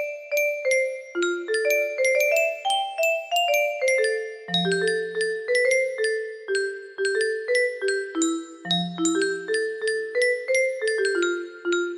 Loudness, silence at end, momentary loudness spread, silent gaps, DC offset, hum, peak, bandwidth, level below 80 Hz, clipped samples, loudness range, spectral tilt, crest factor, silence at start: -24 LUFS; 0 s; 6 LU; none; under 0.1%; none; -10 dBFS; 15.5 kHz; -74 dBFS; under 0.1%; 2 LU; -3 dB/octave; 14 dB; 0 s